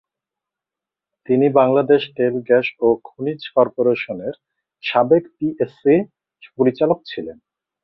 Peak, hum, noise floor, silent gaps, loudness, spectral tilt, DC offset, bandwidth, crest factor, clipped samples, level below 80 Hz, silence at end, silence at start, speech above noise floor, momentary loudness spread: -2 dBFS; none; -87 dBFS; none; -18 LUFS; -9.5 dB/octave; under 0.1%; 5.8 kHz; 18 dB; under 0.1%; -62 dBFS; 0.5 s; 1.3 s; 70 dB; 13 LU